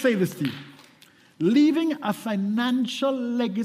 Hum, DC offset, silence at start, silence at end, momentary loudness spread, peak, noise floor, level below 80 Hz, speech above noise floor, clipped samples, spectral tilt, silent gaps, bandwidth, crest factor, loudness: none; under 0.1%; 0 s; 0 s; 9 LU; -10 dBFS; -55 dBFS; -72 dBFS; 32 dB; under 0.1%; -6 dB/octave; none; 15.5 kHz; 16 dB; -24 LUFS